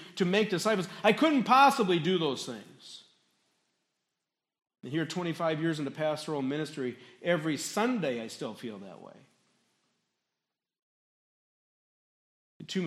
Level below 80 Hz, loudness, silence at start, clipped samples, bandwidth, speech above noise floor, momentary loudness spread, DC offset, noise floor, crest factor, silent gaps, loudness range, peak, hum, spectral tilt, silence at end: -82 dBFS; -29 LUFS; 0 s; under 0.1%; 14.5 kHz; 60 dB; 21 LU; under 0.1%; -89 dBFS; 22 dB; 10.82-12.60 s; 13 LU; -10 dBFS; none; -5 dB/octave; 0 s